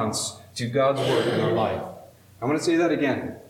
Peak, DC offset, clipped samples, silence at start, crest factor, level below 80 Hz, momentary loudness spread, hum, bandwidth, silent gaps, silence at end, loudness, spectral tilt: -10 dBFS; under 0.1%; under 0.1%; 0 s; 14 dB; -64 dBFS; 10 LU; none; 16 kHz; none; 0.1 s; -24 LUFS; -5 dB/octave